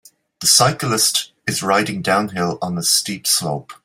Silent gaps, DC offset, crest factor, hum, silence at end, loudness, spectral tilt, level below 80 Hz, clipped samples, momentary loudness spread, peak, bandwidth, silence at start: none; under 0.1%; 18 dB; none; 0.1 s; -17 LUFS; -2.5 dB/octave; -58 dBFS; under 0.1%; 9 LU; 0 dBFS; 16.5 kHz; 0.4 s